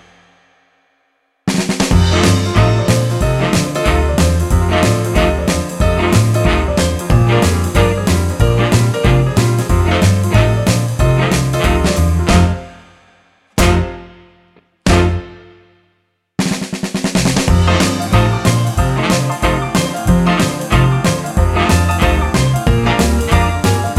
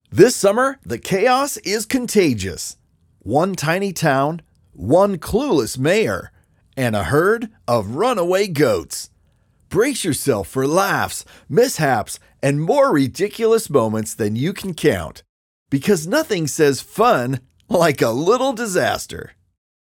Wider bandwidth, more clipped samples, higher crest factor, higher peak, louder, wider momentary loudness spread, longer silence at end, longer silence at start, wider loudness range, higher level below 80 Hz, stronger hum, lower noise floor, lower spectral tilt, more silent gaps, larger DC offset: about the same, 16 kHz vs 17.5 kHz; neither; about the same, 14 dB vs 18 dB; about the same, 0 dBFS vs 0 dBFS; first, -14 LUFS vs -18 LUFS; second, 5 LU vs 10 LU; second, 0 s vs 0.75 s; first, 1.45 s vs 0.1 s; first, 5 LU vs 2 LU; first, -22 dBFS vs -48 dBFS; neither; first, -63 dBFS vs -58 dBFS; about the same, -5.5 dB/octave vs -5 dB/octave; second, none vs 15.29-15.66 s; neither